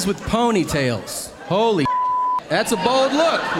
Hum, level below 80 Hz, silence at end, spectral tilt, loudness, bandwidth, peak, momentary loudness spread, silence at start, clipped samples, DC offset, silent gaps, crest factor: none; -44 dBFS; 0 s; -4.5 dB/octave; -19 LUFS; 16.5 kHz; -4 dBFS; 6 LU; 0 s; under 0.1%; under 0.1%; none; 16 dB